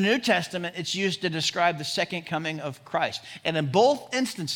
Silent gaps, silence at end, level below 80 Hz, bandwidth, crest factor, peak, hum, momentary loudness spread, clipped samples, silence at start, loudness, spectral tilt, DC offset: none; 0 s; -70 dBFS; 18 kHz; 18 dB; -8 dBFS; none; 9 LU; under 0.1%; 0 s; -26 LUFS; -4 dB/octave; under 0.1%